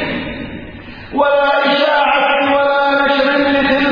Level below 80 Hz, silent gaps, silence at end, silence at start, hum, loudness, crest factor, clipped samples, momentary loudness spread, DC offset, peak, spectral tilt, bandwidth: -42 dBFS; none; 0 s; 0 s; none; -13 LUFS; 14 dB; under 0.1%; 15 LU; under 0.1%; 0 dBFS; -6 dB/octave; 5.4 kHz